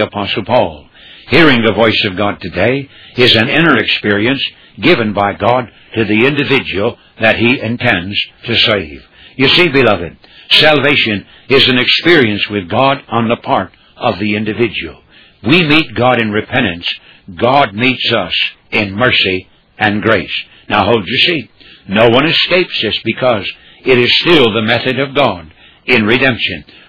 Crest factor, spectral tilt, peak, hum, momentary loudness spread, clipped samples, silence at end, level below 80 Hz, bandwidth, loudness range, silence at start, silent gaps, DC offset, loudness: 12 dB; -6.5 dB/octave; 0 dBFS; none; 11 LU; 0.3%; 0.25 s; -44 dBFS; 5.4 kHz; 3 LU; 0 s; none; under 0.1%; -11 LUFS